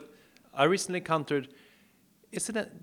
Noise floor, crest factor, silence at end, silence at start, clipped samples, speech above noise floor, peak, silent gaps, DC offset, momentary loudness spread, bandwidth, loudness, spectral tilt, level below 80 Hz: -64 dBFS; 24 dB; 0.05 s; 0 s; under 0.1%; 34 dB; -8 dBFS; none; under 0.1%; 16 LU; 19.5 kHz; -30 LUFS; -4 dB/octave; -74 dBFS